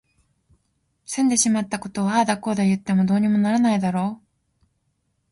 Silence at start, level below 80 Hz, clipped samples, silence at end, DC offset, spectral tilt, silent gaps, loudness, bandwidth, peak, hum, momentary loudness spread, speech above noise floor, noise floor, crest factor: 1.1 s; -62 dBFS; under 0.1%; 1.15 s; under 0.1%; -5 dB/octave; none; -21 LUFS; 11.5 kHz; -6 dBFS; none; 9 LU; 51 dB; -71 dBFS; 16 dB